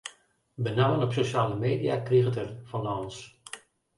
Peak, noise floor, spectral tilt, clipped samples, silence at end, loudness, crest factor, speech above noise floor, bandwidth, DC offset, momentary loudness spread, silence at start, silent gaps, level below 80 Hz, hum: -12 dBFS; -59 dBFS; -6.5 dB/octave; under 0.1%; 0.4 s; -28 LUFS; 16 dB; 32 dB; 11.5 kHz; under 0.1%; 19 LU; 0.05 s; none; -60 dBFS; none